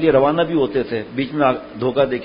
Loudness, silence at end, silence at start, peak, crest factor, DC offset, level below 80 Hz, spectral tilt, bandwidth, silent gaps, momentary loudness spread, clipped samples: -19 LUFS; 0 s; 0 s; -2 dBFS; 16 dB; under 0.1%; -48 dBFS; -11.5 dB/octave; 5.4 kHz; none; 8 LU; under 0.1%